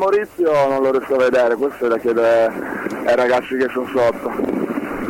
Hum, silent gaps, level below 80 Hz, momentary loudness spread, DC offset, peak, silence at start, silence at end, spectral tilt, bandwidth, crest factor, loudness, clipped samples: none; none; -52 dBFS; 7 LU; under 0.1%; -6 dBFS; 0 s; 0 s; -6 dB/octave; 17 kHz; 12 dB; -18 LUFS; under 0.1%